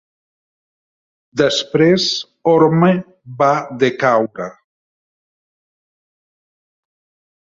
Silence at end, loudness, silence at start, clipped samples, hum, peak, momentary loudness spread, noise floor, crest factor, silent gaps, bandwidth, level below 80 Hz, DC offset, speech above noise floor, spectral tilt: 2.9 s; -15 LUFS; 1.35 s; under 0.1%; none; -2 dBFS; 13 LU; under -90 dBFS; 16 dB; none; 7.8 kHz; -58 dBFS; under 0.1%; over 75 dB; -5.5 dB/octave